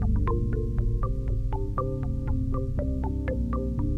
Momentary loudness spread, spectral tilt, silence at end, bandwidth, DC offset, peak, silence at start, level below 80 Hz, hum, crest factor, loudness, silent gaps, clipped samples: 3 LU; -10.5 dB/octave; 0 s; 3.6 kHz; 0.3%; -14 dBFS; 0 s; -28 dBFS; none; 12 dB; -29 LUFS; none; under 0.1%